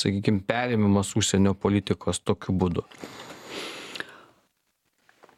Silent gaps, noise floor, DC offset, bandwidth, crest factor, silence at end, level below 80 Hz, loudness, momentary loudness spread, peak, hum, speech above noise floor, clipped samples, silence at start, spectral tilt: none; -74 dBFS; under 0.1%; 14 kHz; 22 dB; 1.2 s; -54 dBFS; -26 LUFS; 17 LU; -4 dBFS; none; 49 dB; under 0.1%; 0 s; -5 dB/octave